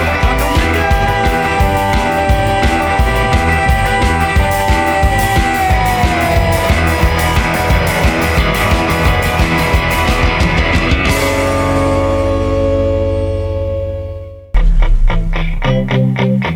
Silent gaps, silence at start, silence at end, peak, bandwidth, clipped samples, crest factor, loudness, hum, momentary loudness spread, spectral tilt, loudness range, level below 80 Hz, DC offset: none; 0 s; 0 s; 0 dBFS; over 20 kHz; under 0.1%; 12 dB; -13 LUFS; none; 5 LU; -5.5 dB/octave; 4 LU; -18 dBFS; under 0.1%